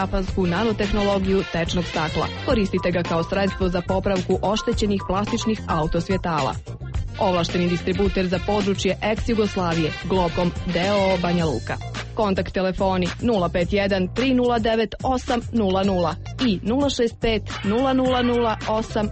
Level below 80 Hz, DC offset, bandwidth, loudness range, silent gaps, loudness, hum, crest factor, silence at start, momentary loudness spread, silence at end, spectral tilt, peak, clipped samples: -34 dBFS; under 0.1%; 8.4 kHz; 2 LU; none; -22 LUFS; none; 14 dB; 0 s; 4 LU; 0 s; -6 dB/octave; -8 dBFS; under 0.1%